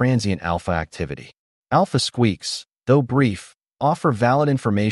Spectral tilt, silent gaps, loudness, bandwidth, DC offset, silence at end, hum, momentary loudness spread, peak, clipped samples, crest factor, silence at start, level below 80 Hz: -6 dB/octave; 1.39-1.63 s; -21 LUFS; 11.5 kHz; under 0.1%; 0 s; none; 11 LU; -6 dBFS; under 0.1%; 16 dB; 0 s; -46 dBFS